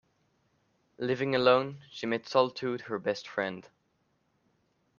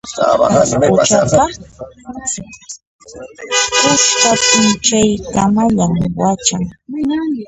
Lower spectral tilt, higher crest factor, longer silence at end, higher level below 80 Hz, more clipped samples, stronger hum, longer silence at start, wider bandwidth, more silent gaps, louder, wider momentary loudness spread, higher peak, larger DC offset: first, -5.5 dB/octave vs -3.5 dB/octave; first, 24 dB vs 14 dB; first, 1.4 s vs 0 s; second, -74 dBFS vs -40 dBFS; neither; neither; first, 1 s vs 0.05 s; second, 7.2 kHz vs 10.5 kHz; second, none vs 2.87-2.99 s; second, -30 LUFS vs -13 LUFS; second, 13 LU vs 21 LU; second, -8 dBFS vs 0 dBFS; neither